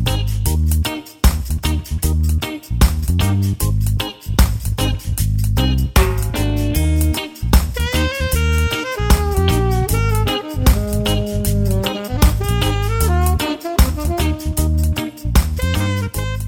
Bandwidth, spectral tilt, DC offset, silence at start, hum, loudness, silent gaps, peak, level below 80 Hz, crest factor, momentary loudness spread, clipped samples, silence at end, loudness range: 20 kHz; -5 dB/octave; under 0.1%; 0 s; none; -18 LUFS; none; 0 dBFS; -20 dBFS; 16 dB; 4 LU; under 0.1%; 0 s; 1 LU